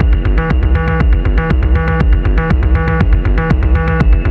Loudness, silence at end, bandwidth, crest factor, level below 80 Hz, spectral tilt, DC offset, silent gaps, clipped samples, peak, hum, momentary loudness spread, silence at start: -13 LUFS; 0 s; 4.8 kHz; 10 dB; -12 dBFS; -9.5 dB/octave; under 0.1%; none; under 0.1%; 0 dBFS; none; 1 LU; 0 s